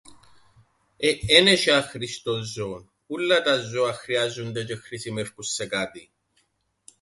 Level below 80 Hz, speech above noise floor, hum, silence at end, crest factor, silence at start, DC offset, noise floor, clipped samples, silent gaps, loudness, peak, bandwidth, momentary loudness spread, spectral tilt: -54 dBFS; 46 dB; none; 1 s; 24 dB; 0.1 s; under 0.1%; -70 dBFS; under 0.1%; none; -23 LUFS; 0 dBFS; 11.5 kHz; 17 LU; -3 dB/octave